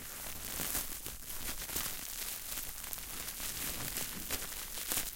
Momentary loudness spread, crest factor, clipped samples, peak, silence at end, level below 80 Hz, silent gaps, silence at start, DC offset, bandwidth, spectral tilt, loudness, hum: 6 LU; 28 dB; under 0.1%; -12 dBFS; 0 s; -52 dBFS; none; 0 s; under 0.1%; 17 kHz; -1 dB/octave; -38 LUFS; none